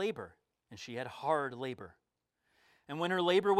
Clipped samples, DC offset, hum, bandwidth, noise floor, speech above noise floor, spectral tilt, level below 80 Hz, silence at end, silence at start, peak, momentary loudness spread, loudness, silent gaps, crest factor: under 0.1%; under 0.1%; none; 13 kHz; -82 dBFS; 48 dB; -5.5 dB/octave; -78 dBFS; 0 s; 0 s; -16 dBFS; 21 LU; -35 LUFS; none; 20 dB